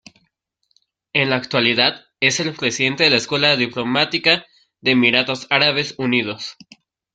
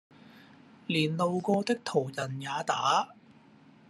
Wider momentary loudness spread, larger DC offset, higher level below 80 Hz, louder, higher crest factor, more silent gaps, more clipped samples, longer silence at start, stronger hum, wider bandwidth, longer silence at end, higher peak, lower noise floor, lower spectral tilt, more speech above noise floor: about the same, 6 LU vs 8 LU; neither; first, -60 dBFS vs -78 dBFS; first, -17 LUFS vs -30 LUFS; about the same, 20 dB vs 18 dB; neither; neither; first, 1.15 s vs 0.35 s; neither; second, 9.2 kHz vs 13 kHz; second, 0.6 s vs 0.75 s; first, 0 dBFS vs -14 dBFS; first, -69 dBFS vs -57 dBFS; second, -3.5 dB/octave vs -5 dB/octave; first, 51 dB vs 28 dB